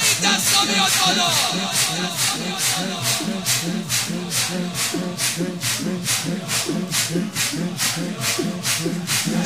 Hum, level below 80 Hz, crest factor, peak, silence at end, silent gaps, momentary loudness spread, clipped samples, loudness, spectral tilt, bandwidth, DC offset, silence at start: none; -60 dBFS; 20 dB; -2 dBFS; 0 s; none; 7 LU; under 0.1%; -20 LUFS; -2 dB/octave; 16 kHz; 0.2%; 0 s